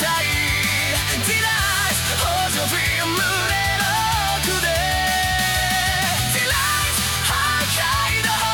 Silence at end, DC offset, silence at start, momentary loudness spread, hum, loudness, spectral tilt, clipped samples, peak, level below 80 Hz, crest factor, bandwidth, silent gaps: 0 s; under 0.1%; 0 s; 1 LU; none; -18 LUFS; -2 dB/octave; under 0.1%; -4 dBFS; -34 dBFS; 16 dB; 19 kHz; none